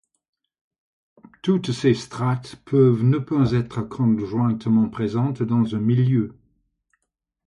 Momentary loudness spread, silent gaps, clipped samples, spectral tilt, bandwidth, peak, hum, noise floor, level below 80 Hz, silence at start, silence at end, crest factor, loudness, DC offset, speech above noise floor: 7 LU; none; under 0.1%; -8.5 dB/octave; 10.5 kHz; -6 dBFS; none; -79 dBFS; -54 dBFS; 1.45 s; 1.15 s; 16 dB; -21 LUFS; under 0.1%; 58 dB